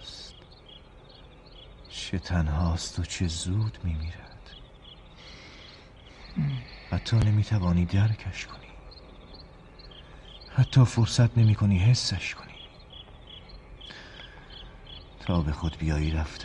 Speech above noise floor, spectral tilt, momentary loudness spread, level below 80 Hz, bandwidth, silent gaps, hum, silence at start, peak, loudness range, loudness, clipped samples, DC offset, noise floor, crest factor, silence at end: 25 dB; -6 dB/octave; 26 LU; -40 dBFS; 10.5 kHz; none; none; 0 s; -8 dBFS; 11 LU; -27 LUFS; under 0.1%; under 0.1%; -50 dBFS; 20 dB; 0 s